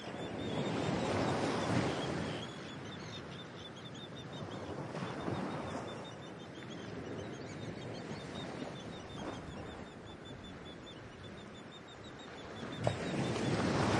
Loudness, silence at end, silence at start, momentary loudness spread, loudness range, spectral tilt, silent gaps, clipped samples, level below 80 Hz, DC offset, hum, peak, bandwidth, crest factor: -41 LUFS; 0 s; 0 s; 15 LU; 10 LU; -5.5 dB/octave; none; under 0.1%; -62 dBFS; under 0.1%; none; -14 dBFS; 11.5 kHz; 26 dB